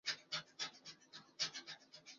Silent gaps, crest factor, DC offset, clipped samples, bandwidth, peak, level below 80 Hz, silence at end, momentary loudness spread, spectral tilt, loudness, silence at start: none; 22 dB; under 0.1%; under 0.1%; 7.4 kHz; -26 dBFS; -88 dBFS; 0 s; 15 LU; 1.5 dB/octave; -45 LUFS; 0.05 s